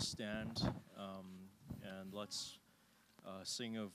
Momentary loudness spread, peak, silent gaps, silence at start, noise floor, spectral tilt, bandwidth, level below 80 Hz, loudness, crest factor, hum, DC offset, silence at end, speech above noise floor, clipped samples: 14 LU; -26 dBFS; none; 0 s; -72 dBFS; -4 dB/octave; 15.5 kHz; -66 dBFS; -46 LUFS; 22 dB; none; under 0.1%; 0 s; 25 dB; under 0.1%